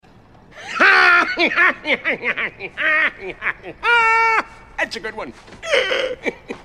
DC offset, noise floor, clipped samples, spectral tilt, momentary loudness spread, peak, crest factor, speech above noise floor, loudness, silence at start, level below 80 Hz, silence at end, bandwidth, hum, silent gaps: 0.1%; -47 dBFS; under 0.1%; -2.5 dB/octave; 16 LU; 0 dBFS; 18 dB; 27 dB; -16 LUFS; 0.55 s; -50 dBFS; 0.05 s; 13.5 kHz; none; none